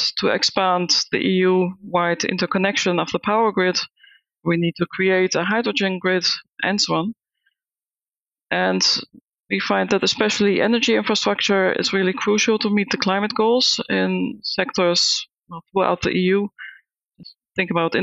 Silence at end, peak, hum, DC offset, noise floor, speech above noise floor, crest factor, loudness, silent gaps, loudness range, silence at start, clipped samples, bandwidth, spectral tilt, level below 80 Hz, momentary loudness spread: 0 s; -2 dBFS; none; under 0.1%; under -90 dBFS; over 70 dB; 18 dB; -19 LUFS; 9.21-9.25 s; 4 LU; 0 s; under 0.1%; 8.2 kHz; -3.5 dB/octave; -60 dBFS; 7 LU